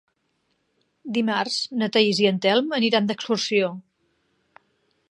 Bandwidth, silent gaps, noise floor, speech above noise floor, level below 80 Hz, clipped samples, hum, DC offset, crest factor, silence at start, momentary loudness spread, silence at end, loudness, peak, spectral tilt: 11 kHz; none; -72 dBFS; 50 dB; -76 dBFS; under 0.1%; none; under 0.1%; 20 dB; 1.05 s; 9 LU; 1.3 s; -22 LUFS; -4 dBFS; -4.5 dB/octave